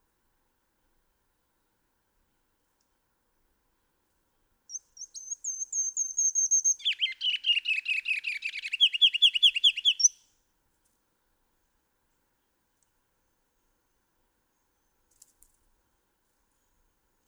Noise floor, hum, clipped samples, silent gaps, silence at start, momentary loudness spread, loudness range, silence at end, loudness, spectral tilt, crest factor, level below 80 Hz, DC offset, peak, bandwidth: -75 dBFS; none; under 0.1%; none; 4.7 s; 19 LU; 12 LU; 7.15 s; -24 LUFS; 7.5 dB/octave; 22 dB; -78 dBFS; under 0.1%; -10 dBFS; over 20 kHz